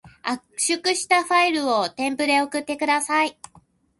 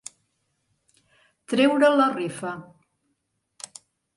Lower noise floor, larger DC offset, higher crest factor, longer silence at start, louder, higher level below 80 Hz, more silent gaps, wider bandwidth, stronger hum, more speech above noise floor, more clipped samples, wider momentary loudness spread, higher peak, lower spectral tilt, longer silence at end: second, -56 dBFS vs -76 dBFS; neither; about the same, 18 dB vs 20 dB; second, 0.05 s vs 1.5 s; about the same, -21 LUFS vs -22 LUFS; first, -66 dBFS vs -76 dBFS; neither; about the same, 12 kHz vs 11.5 kHz; neither; second, 34 dB vs 54 dB; neither; second, 8 LU vs 23 LU; about the same, -6 dBFS vs -6 dBFS; second, -1.5 dB/octave vs -4.5 dB/octave; second, 0.7 s vs 1.55 s